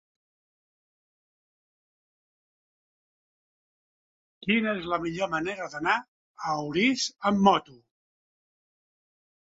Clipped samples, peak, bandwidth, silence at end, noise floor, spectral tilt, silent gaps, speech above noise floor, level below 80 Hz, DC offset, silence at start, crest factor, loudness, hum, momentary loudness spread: under 0.1%; -6 dBFS; 7.8 kHz; 1.8 s; under -90 dBFS; -4.5 dB/octave; 6.08-6.35 s; over 64 dB; -66 dBFS; under 0.1%; 4.45 s; 24 dB; -27 LUFS; none; 9 LU